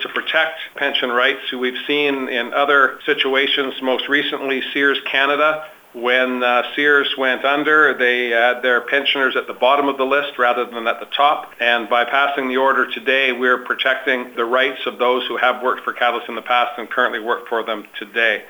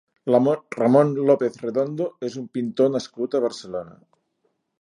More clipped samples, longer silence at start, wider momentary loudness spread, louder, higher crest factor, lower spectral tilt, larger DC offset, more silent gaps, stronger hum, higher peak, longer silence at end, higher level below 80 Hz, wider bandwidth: neither; second, 0 s vs 0.25 s; second, 7 LU vs 12 LU; first, -17 LUFS vs -22 LUFS; about the same, 18 dB vs 20 dB; second, -3.5 dB/octave vs -7 dB/octave; neither; neither; neither; first, 0 dBFS vs -4 dBFS; second, 0 s vs 0.9 s; about the same, -70 dBFS vs -70 dBFS; first, over 20 kHz vs 11 kHz